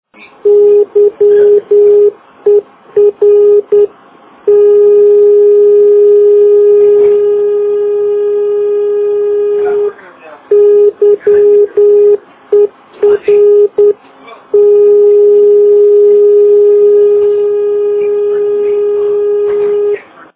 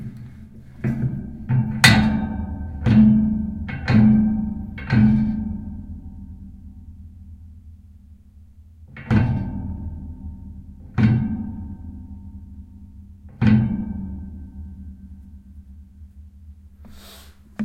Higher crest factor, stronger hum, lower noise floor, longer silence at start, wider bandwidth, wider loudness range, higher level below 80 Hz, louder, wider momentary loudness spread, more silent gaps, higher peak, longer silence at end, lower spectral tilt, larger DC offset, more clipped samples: second, 8 dB vs 22 dB; second, none vs 50 Hz at -45 dBFS; second, -39 dBFS vs -46 dBFS; first, 0.45 s vs 0 s; second, 3.4 kHz vs 15.5 kHz; second, 4 LU vs 19 LU; second, -56 dBFS vs -38 dBFS; first, -8 LUFS vs -20 LUFS; second, 6 LU vs 27 LU; neither; about the same, 0 dBFS vs 0 dBFS; first, 0.35 s vs 0 s; first, -10 dB/octave vs -6 dB/octave; neither; neither